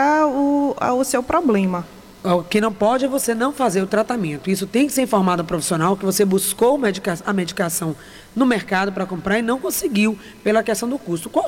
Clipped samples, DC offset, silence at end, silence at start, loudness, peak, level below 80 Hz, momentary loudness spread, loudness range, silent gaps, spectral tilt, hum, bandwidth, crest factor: under 0.1%; under 0.1%; 0 s; 0 s; -19 LUFS; -6 dBFS; -50 dBFS; 7 LU; 2 LU; none; -4.5 dB/octave; none; 17 kHz; 14 dB